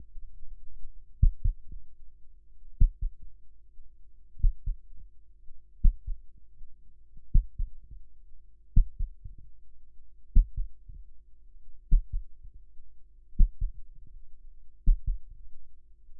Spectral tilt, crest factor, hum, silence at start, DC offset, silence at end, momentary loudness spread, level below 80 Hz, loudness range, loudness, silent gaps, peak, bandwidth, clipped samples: -13.5 dB/octave; 22 dB; none; 0 s; under 0.1%; 0 s; 25 LU; -30 dBFS; 2 LU; -34 LUFS; none; -8 dBFS; 0.4 kHz; under 0.1%